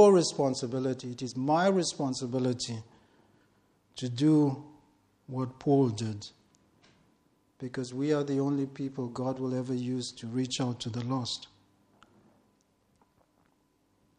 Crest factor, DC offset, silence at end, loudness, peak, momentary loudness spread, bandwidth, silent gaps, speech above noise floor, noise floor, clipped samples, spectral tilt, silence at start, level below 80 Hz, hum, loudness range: 22 dB; under 0.1%; 2.75 s; -30 LUFS; -8 dBFS; 14 LU; 10.5 kHz; none; 41 dB; -71 dBFS; under 0.1%; -6 dB/octave; 0 s; -70 dBFS; none; 6 LU